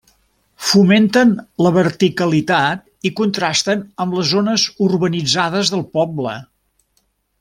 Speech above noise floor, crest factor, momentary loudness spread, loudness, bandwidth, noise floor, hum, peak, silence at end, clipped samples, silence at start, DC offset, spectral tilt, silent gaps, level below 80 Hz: 49 dB; 16 dB; 10 LU; -16 LUFS; 15.5 kHz; -64 dBFS; none; -2 dBFS; 1 s; under 0.1%; 0.6 s; under 0.1%; -4.5 dB/octave; none; -56 dBFS